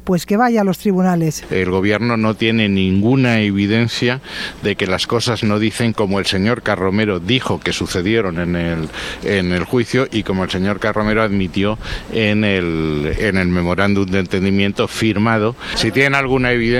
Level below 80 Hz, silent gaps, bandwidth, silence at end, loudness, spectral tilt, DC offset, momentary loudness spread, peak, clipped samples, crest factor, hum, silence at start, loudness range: -38 dBFS; none; 15.5 kHz; 0 s; -17 LUFS; -5.5 dB/octave; under 0.1%; 5 LU; 0 dBFS; under 0.1%; 16 dB; none; 0 s; 2 LU